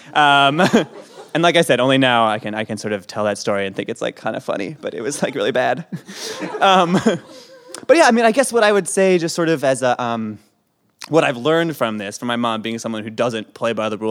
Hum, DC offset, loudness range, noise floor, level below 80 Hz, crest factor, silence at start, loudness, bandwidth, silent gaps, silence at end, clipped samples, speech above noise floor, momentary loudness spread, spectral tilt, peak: none; under 0.1%; 6 LU; -64 dBFS; -68 dBFS; 18 dB; 0.05 s; -17 LUFS; 17 kHz; none; 0 s; under 0.1%; 46 dB; 13 LU; -4.5 dB/octave; 0 dBFS